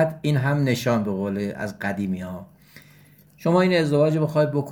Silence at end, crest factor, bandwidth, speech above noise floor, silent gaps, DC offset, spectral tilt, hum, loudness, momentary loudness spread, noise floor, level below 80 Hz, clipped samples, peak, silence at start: 0 s; 16 dB; 17.5 kHz; 30 dB; none; under 0.1%; -7 dB/octave; none; -22 LUFS; 10 LU; -52 dBFS; -60 dBFS; under 0.1%; -6 dBFS; 0 s